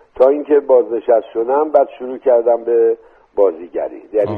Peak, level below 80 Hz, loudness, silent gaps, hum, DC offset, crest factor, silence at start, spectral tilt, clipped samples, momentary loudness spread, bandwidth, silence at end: 0 dBFS; -58 dBFS; -15 LUFS; none; none; under 0.1%; 14 dB; 0.2 s; -9 dB/octave; under 0.1%; 12 LU; 4.3 kHz; 0 s